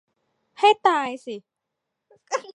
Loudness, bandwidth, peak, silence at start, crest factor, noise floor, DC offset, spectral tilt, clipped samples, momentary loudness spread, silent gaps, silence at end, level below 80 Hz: -21 LUFS; 10.5 kHz; -4 dBFS; 0.6 s; 20 dB; -82 dBFS; under 0.1%; -2 dB/octave; under 0.1%; 19 LU; none; 0.05 s; -84 dBFS